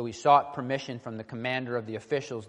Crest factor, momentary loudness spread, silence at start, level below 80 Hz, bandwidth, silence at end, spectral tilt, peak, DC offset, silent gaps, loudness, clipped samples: 20 dB; 15 LU; 0 s; -70 dBFS; 9.8 kHz; 0 s; -5.5 dB/octave; -8 dBFS; under 0.1%; none; -28 LUFS; under 0.1%